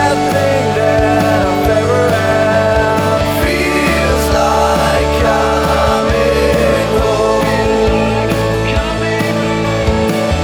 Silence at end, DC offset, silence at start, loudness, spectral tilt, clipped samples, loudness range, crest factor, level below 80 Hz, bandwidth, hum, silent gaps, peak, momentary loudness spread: 0 s; under 0.1%; 0 s; -12 LUFS; -5.5 dB/octave; under 0.1%; 1 LU; 12 dB; -24 dBFS; over 20 kHz; none; none; 0 dBFS; 3 LU